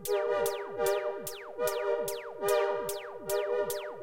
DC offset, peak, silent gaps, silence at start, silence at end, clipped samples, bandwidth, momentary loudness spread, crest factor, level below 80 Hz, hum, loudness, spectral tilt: under 0.1%; -16 dBFS; none; 0 s; 0 s; under 0.1%; 17 kHz; 8 LU; 16 dB; -64 dBFS; none; -32 LUFS; -2.5 dB/octave